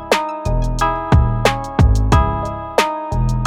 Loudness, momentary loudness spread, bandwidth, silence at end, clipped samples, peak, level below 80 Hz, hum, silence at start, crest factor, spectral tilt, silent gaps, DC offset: -17 LUFS; 6 LU; 15.5 kHz; 0 s; under 0.1%; -2 dBFS; -20 dBFS; none; 0 s; 14 dB; -6 dB/octave; none; under 0.1%